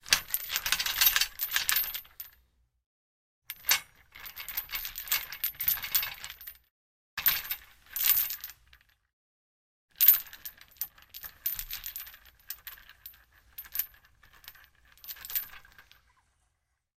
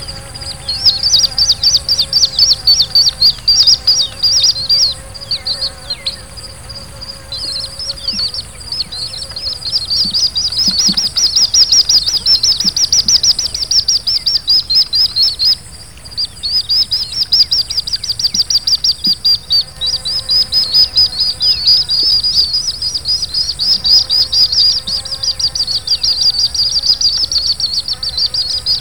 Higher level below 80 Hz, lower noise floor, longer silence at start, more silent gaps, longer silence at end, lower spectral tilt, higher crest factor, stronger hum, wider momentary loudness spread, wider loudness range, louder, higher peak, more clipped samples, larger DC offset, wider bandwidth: second, -60 dBFS vs -36 dBFS; first, -78 dBFS vs -33 dBFS; about the same, 0.05 s vs 0 s; first, 2.86-3.42 s, 6.71-7.17 s, 9.13-9.88 s vs none; first, 1.15 s vs 0 s; second, 2 dB/octave vs 0 dB/octave; first, 32 dB vs 14 dB; neither; first, 23 LU vs 12 LU; first, 12 LU vs 8 LU; second, -28 LUFS vs -10 LUFS; about the same, -2 dBFS vs 0 dBFS; neither; second, under 0.1% vs 1%; second, 16.5 kHz vs over 20 kHz